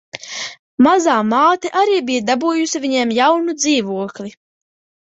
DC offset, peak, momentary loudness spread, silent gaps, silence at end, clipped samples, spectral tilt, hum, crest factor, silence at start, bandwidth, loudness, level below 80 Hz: under 0.1%; -2 dBFS; 14 LU; 0.59-0.78 s; 0.75 s; under 0.1%; -3 dB/octave; none; 16 dB; 0.15 s; 8.2 kHz; -16 LUFS; -62 dBFS